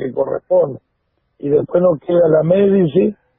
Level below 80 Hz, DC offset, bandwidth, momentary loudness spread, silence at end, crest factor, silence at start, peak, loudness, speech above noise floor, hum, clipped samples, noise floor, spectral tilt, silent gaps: -56 dBFS; 0.1%; 3.8 kHz; 9 LU; 0.25 s; 14 dB; 0 s; 0 dBFS; -15 LUFS; 53 dB; none; under 0.1%; -67 dBFS; -13.5 dB/octave; none